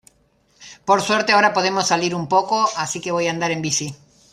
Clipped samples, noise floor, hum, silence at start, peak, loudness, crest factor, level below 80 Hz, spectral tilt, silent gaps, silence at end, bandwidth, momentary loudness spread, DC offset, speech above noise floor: under 0.1%; -60 dBFS; none; 0.6 s; -2 dBFS; -19 LUFS; 18 dB; -62 dBFS; -3 dB/octave; none; 0.4 s; 15 kHz; 8 LU; under 0.1%; 41 dB